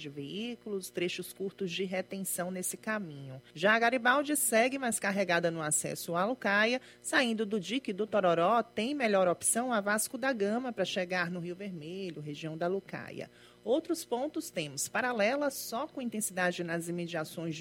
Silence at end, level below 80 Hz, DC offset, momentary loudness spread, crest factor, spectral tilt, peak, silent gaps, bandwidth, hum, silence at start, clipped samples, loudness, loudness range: 0 s; -76 dBFS; under 0.1%; 13 LU; 22 dB; -3.5 dB/octave; -12 dBFS; none; 16 kHz; none; 0 s; under 0.1%; -32 LUFS; 7 LU